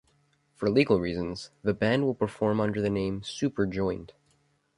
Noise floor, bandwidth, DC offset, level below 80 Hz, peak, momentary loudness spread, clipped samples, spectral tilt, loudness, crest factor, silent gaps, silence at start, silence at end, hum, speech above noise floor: -69 dBFS; 11 kHz; under 0.1%; -54 dBFS; -8 dBFS; 8 LU; under 0.1%; -6.5 dB/octave; -28 LUFS; 20 dB; none; 0.6 s; 0.7 s; none; 41 dB